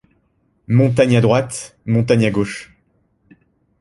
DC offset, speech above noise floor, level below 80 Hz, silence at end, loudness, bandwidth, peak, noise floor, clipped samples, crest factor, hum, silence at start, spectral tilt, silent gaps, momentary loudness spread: under 0.1%; 47 dB; -48 dBFS; 1.15 s; -16 LUFS; 11.5 kHz; -2 dBFS; -62 dBFS; under 0.1%; 16 dB; none; 0.7 s; -6.5 dB/octave; none; 13 LU